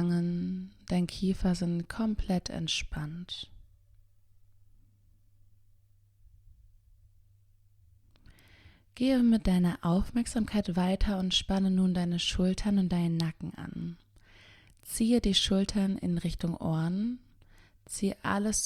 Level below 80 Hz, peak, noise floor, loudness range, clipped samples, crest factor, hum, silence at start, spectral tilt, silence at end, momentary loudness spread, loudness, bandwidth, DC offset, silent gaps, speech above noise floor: -44 dBFS; -14 dBFS; -63 dBFS; 9 LU; under 0.1%; 18 dB; none; 0 s; -5 dB/octave; 0 s; 14 LU; -30 LUFS; 14 kHz; under 0.1%; none; 34 dB